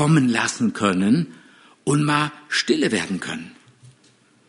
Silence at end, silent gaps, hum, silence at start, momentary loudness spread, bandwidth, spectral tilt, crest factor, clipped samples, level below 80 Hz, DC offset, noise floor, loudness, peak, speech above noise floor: 0.95 s; none; none; 0 s; 13 LU; 11 kHz; -5 dB/octave; 18 dB; under 0.1%; -62 dBFS; under 0.1%; -57 dBFS; -21 LUFS; -2 dBFS; 37 dB